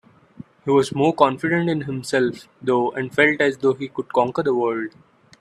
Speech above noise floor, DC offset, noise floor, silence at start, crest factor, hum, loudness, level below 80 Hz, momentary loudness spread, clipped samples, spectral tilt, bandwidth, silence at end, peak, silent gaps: 24 dB; under 0.1%; -44 dBFS; 0.4 s; 20 dB; none; -20 LUFS; -62 dBFS; 9 LU; under 0.1%; -6 dB/octave; 12.5 kHz; 0.5 s; 0 dBFS; none